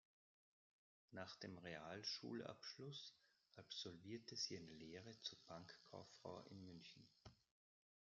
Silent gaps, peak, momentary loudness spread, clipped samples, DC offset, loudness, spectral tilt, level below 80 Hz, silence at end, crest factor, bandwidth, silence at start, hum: none; -36 dBFS; 14 LU; under 0.1%; under 0.1%; -55 LUFS; -3 dB/octave; -88 dBFS; 0.7 s; 22 dB; 7.2 kHz; 1.1 s; none